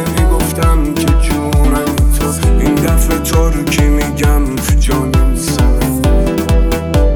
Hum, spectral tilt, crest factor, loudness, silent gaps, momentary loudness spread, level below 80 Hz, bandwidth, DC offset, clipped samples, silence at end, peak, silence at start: none; -5.5 dB/octave; 10 dB; -13 LUFS; none; 1 LU; -12 dBFS; 19.5 kHz; under 0.1%; under 0.1%; 0 s; 0 dBFS; 0 s